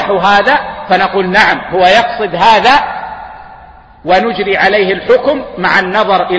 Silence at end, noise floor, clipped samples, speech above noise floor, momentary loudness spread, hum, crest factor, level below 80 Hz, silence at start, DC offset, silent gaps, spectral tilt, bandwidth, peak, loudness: 0 s; -36 dBFS; 0.3%; 26 dB; 10 LU; none; 10 dB; -40 dBFS; 0 s; 0.4%; none; -4.5 dB/octave; 11 kHz; 0 dBFS; -10 LUFS